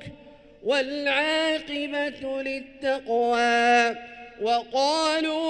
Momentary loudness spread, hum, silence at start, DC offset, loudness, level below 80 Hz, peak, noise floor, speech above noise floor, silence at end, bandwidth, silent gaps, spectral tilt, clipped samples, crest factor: 11 LU; none; 0 s; under 0.1%; -24 LUFS; -60 dBFS; -8 dBFS; -49 dBFS; 25 dB; 0 s; 11 kHz; none; -2.5 dB/octave; under 0.1%; 16 dB